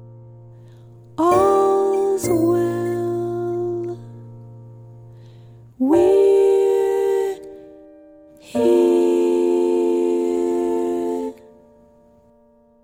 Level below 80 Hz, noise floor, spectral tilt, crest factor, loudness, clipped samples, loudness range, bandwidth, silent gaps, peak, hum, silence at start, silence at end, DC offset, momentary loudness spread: -56 dBFS; -54 dBFS; -6.5 dB/octave; 16 dB; -18 LUFS; under 0.1%; 5 LU; over 20 kHz; none; -4 dBFS; none; 0 s; 1.5 s; under 0.1%; 15 LU